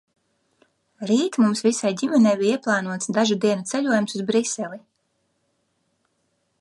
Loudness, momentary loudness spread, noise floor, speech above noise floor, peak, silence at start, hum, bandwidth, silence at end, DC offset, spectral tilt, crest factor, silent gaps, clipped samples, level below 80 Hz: -21 LUFS; 9 LU; -71 dBFS; 50 dB; -6 dBFS; 1 s; none; 11.5 kHz; 1.8 s; under 0.1%; -4.5 dB/octave; 16 dB; none; under 0.1%; -74 dBFS